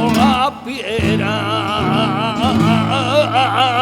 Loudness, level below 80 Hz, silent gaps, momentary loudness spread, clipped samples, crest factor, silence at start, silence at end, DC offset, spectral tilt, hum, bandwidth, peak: -15 LUFS; -40 dBFS; none; 5 LU; under 0.1%; 14 dB; 0 s; 0 s; under 0.1%; -5.5 dB/octave; none; 18 kHz; -2 dBFS